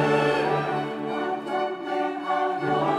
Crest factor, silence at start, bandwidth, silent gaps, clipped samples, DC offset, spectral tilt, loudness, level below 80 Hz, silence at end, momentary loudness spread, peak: 14 dB; 0 s; 13 kHz; none; under 0.1%; under 0.1%; -6.5 dB/octave; -26 LUFS; -64 dBFS; 0 s; 6 LU; -10 dBFS